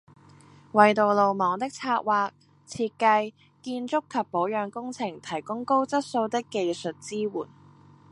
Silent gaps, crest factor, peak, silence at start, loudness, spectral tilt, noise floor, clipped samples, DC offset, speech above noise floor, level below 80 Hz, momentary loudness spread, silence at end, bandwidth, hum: none; 24 dB; -2 dBFS; 0.75 s; -26 LUFS; -5 dB/octave; -53 dBFS; under 0.1%; under 0.1%; 28 dB; -72 dBFS; 13 LU; 0.65 s; 11.5 kHz; none